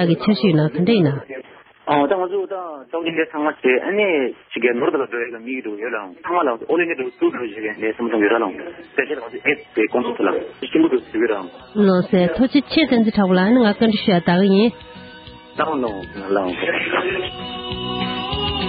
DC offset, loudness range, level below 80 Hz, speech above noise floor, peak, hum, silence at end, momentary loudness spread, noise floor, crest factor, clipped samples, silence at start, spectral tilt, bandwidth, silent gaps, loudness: under 0.1%; 5 LU; -48 dBFS; 22 dB; -2 dBFS; none; 0 s; 12 LU; -40 dBFS; 16 dB; under 0.1%; 0 s; -11.5 dB/octave; 5.2 kHz; none; -19 LUFS